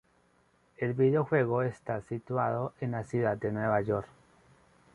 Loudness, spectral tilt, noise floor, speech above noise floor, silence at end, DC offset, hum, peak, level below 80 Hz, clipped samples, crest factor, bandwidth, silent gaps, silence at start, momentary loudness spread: -31 LUFS; -9 dB/octave; -68 dBFS; 38 dB; 0.9 s; under 0.1%; none; -14 dBFS; -62 dBFS; under 0.1%; 18 dB; 10.5 kHz; none; 0.8 s; 9 LU